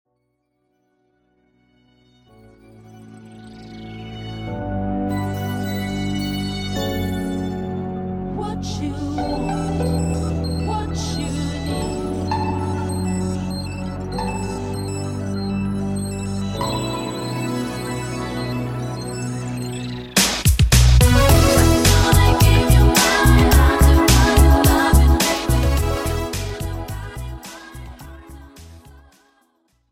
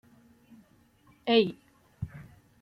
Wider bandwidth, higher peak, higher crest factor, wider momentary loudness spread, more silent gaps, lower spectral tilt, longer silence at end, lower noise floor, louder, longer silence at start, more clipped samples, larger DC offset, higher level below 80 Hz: first, 16.5 kHz vs 5.8 kHz; first, -2 dBFS vs -10 dBFS; second, 16 dB vs 24 dB; second, 15 LU vs 25 LU; neither; second, -5 dB/octave vs -7 dB/octave; first, 1.15 s vs 0.4 s; first, -70 dBFS vs -62 dBFS; first, -19 LUFS vs -29 LUFS; first, 2.85 s vs 1.25 s; neither; neither; first, -24 dBFS vs -62 dBFS